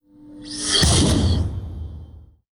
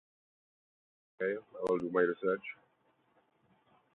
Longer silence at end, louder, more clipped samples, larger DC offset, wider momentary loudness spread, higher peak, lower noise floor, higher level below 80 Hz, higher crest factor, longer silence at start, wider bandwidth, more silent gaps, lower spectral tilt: second, 0.3 s vs 1.4 s; first, -18 LUFS vs -34 LUFS; neither; neither; first, 22 LU vs 11 LU; first, -6 dBFS vs -16 dBFS; second, -43 dBFS vs -73 dBFS; first, -30 dBFS vs -78 dBFS; second, 16 dB vs 22 dB; second, 0.2 s vs 1.2 s; first, over 20 kHz vs 4.2 kHz; neither; about the same, -4 dB/octave vs -5 dB/octave